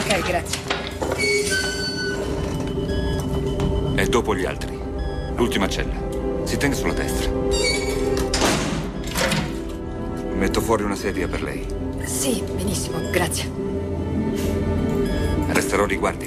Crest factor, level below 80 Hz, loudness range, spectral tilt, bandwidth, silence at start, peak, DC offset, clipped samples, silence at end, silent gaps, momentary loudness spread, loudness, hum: 18 dB; -32 dBFS; 2 LU; -4.5 dB/octave; 15.5 kHz; 0 s; -4 dBFS; under 0.1%; under 0.1%; 0 s; none; 7 LU; -23 LUFS; none